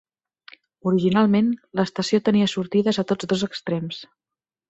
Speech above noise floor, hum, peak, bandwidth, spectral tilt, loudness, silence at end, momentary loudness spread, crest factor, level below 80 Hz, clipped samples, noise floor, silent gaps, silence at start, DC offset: 68 dB; none; -6 dBFS; 8 kHz; -6 dB/octave; -22 LUFS; 0.65 s; 10 LU; 16 dB; -62 dBFS; under 0.1%; -89 dBFS; none; 0.85 s; under 0.1%